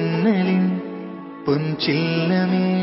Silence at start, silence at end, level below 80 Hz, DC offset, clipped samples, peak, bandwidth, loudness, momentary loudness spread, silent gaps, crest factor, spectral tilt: 0 s; 0 s; -60 dBFS; under 0.1%; under 0.1%; -6 dBFS; 5.8 kHz; -20 LUFS; 12 LU; none; 14 dB; -10.5 dB/octave